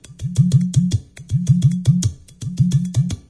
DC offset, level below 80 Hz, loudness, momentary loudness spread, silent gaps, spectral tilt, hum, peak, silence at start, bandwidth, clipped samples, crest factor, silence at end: under 0.1%; -40 dBFS; -18 LUFS; 9 LU; none; -7 dB/octave; none; -4 dBFS; 0.1 s; 11 kHz; under 0.1%; 14 dB; 0.1 s